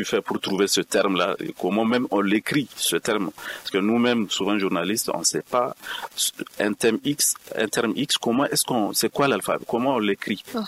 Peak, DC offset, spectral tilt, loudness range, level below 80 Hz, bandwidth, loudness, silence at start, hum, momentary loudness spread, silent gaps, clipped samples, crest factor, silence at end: -8 dBFS; under 0.1%; -3 dB/octave; 1 LU; -64 dBFS; 16 kHz; -23 LUFS; 0 s; none; 5 LU; none; under 0.1%; 16 dB; 0 s